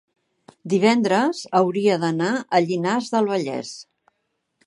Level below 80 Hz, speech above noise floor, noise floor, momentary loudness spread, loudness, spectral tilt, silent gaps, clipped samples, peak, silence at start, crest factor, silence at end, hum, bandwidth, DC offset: -74 dBFS; 54 dB; -75 dBFS; 12 LU; -21 LUFS; -5.5 dB/octave; none; under 0.1%; -2 dBFS; 0.65 s; 20 dB; 0.85 s; none; 11.5 kHz; under 0.1%